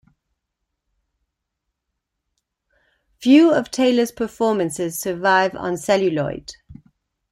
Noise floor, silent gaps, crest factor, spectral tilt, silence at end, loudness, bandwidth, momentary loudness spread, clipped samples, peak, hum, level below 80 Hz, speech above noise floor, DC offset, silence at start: -79 dBFS; none; 18 dB; -4.5 dB/octave; 0.6 s; -19 LUFS; 15.5 kHz; 12 LU; under 0.1%; -2 dBFS; none; -58 dBFS; 61 dB; under 0.1%; 3.2 s